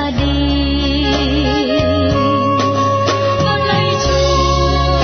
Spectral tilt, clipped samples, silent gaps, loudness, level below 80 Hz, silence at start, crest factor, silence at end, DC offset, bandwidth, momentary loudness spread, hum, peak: -5.5 dB/octave; under 0.1%; none; -14 LUFS; -22 dBFS; 0 s; 12 dB; 0 s; under 0.1%; 6.6 kHz; 2 LU; none; -2 dBFS